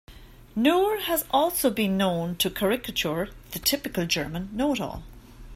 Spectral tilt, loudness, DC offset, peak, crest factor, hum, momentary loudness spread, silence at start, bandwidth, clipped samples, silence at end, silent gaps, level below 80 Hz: -4 dB/octave; -25 LUFS; under 0.1%; -8 dBFS; 18 dB; none; 9 LU; 0.1 s; 16 kHz; under 0.1%; 0 s; none; -48 dBFS